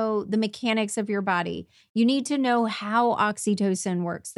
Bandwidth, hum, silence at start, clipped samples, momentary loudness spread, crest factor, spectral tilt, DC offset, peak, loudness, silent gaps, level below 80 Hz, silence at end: 12 kHz; none; 0 s; under 0.1%; 5 LU; 16 dB; -4.5 dB/octave; under 0.1%; -10 dBFS; -25 LUFS; 1.89-1.94 s; -68 dBFS; 0.05 s